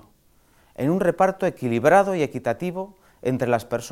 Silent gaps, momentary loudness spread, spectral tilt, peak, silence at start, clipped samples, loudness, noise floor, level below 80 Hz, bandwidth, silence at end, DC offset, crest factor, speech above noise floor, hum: none; 13 LU; -6.5 dB/octave; -2 dBFS; 0.8 s; under 0.1%; -22 LUFS; -58 dBFS; -58 dBFS; 16 kHz; 0 s; under 0.1%; 20 dB; 37 dB; none